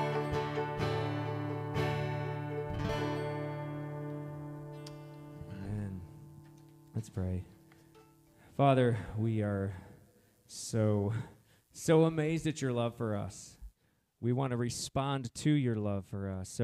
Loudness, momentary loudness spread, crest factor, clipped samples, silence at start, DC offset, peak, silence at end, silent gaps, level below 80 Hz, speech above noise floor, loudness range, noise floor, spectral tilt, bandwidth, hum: -34 LUFS; 18 LU; 20 dB; under 0.1%; 0 s; under 0.1%; -14 dBFS; 0 s; none; -60 dBFS; 42 dB; 10 LU; -74 dBFS; -6.5 dB/octave; 15 kHz; none